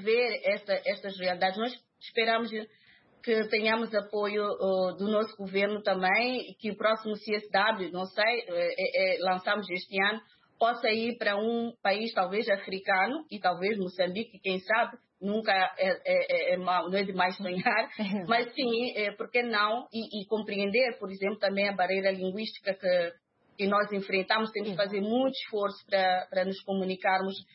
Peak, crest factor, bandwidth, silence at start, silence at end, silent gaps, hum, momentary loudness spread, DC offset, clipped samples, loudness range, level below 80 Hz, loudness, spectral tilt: -12 dBFS; 18 dB; 5.8 kHz; 0 s; 0.1 s; none; none; 7 LU; under 0.1%; under 0.1%; 2 LU; -82 dBFS; -29 LUFS; -8.5 dB/octave